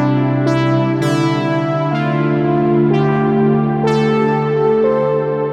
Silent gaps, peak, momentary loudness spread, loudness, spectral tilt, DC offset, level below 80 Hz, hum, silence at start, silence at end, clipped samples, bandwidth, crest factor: none; -4 dBFS; 3 LU; -15 LUFS; -8 dB/octave; under 0.1%; -48 dBFS; none; 0 s; 0 s; under 0.1%; 10.5 kHz; 10 dB